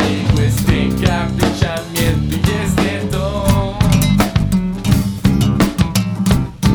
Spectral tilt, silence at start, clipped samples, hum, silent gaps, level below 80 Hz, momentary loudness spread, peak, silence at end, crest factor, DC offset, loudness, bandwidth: -6 dB/octave; 0 s; under 0.1%; none; none; -24 dBFS; 4 LU; 0 dBFS; 0 s; 14 dB; under 0.1%; -16 LUFS; over 20 kHz